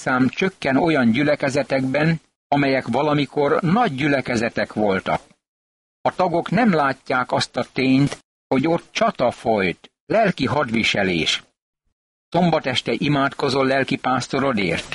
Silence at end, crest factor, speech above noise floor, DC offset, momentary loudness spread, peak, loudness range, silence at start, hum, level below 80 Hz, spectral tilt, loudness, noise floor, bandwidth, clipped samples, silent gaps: 0 s; 14 dB; over 70 dB; under 0.1%; 5 LU; -6 dBFS; 2 LU; 0 s; none; -52 dBFS; -5.5 dB/octave; -20 LUFS; under -90 dBFS; 11.5 kHz; under 0.1%; 2.36-2.50 s, 5.48-6.04 s, 8.24-8.50 s, 10.00-10.07 s, 11.62-11.73 s, 11.92-12.32 s